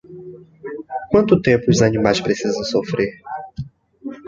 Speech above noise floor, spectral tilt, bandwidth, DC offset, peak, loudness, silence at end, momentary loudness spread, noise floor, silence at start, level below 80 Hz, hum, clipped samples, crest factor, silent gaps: 21 dB; -5.5 dB/octave; 7.8 kHz; under 0.1%; -2 dBFS; -18 LUFS; 0 s; 21 LU; -38 dBFS; 0.1 s; -46 dBFS; none; under 0.1%; 18 dB; none